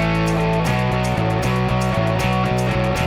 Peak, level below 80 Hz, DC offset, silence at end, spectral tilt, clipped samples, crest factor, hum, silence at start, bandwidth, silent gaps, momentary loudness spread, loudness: -6 dBFS; -32 dBFS; under 0.1%; 0 s; -6.5 dB/octave; under 0.1%; 12 dB; none; 0 s; over 20 kHz; none; 1 LU; -19 LUFS